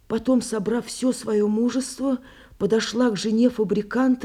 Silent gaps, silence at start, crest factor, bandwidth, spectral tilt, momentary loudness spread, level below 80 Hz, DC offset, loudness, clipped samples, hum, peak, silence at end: none; 0.1 s; 14 dB; 13.5 kHz; -5 dB/octave; 6 LU; -56 dBFS; under 0.1%; -23 LUFS; under 0.1%; none; -8 dBFS; 0 s